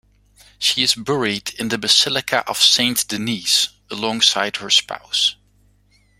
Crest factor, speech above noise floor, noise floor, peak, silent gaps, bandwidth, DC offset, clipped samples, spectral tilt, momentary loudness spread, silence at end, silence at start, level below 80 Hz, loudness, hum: 20 dB; 38 dB; -57 dBFS; 0 dBFS; none; 16 kHz; under 0.1%; under 0.1%; -1.5 dB/octave; 9 LU; 0.85 s; 0.6 s; -58 dBFS; -17 LUFS; 50 Hz at -50 dBFS